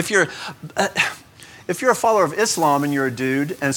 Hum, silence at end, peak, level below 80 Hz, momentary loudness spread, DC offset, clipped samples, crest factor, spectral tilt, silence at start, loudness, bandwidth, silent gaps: none; 0 s; -2 dBFS; -62 dBFS; 11 LU; under 0.1%; under 0.1%; 18 dB; -3.5 dB/octave; 0 s; -20 LUFS; 19 kHz; none